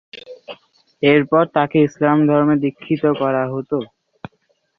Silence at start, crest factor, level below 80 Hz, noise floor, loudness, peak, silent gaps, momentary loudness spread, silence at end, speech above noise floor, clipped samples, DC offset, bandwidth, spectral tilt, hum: 0.15 s; 16 dB; -58 dBFS; -65 dBFS; -17 LUFS; -2 dBFS; none; 22 LU; 0.95 s; 49 dB; under 0.1%; under 0.1%; 6.2 kHz; -8 dB/octave; none